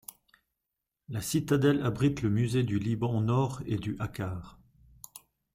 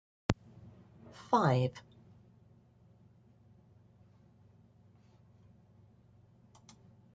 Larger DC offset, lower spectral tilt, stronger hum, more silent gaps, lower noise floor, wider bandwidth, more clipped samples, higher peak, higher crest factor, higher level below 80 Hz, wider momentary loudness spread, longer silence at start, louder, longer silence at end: neither; about the same, -6.5 dB/octave vs -7 dB/octave; neither; neither; first, -86 dBFS vs -63 dBFS; first, 16 kHz vs 7.8 kHz; neither; about the same, -12 dBFS vs -10 dBFS; second, 18 dB vs 30 dB; first, -56 dBFS vs -62 dBFS; second, 22 LU vs 30 LU; first, 1.1 s vs 0.3 s; first, -30 LUFS vs -33 LUFS; second, 0.35 s vs 5.35 s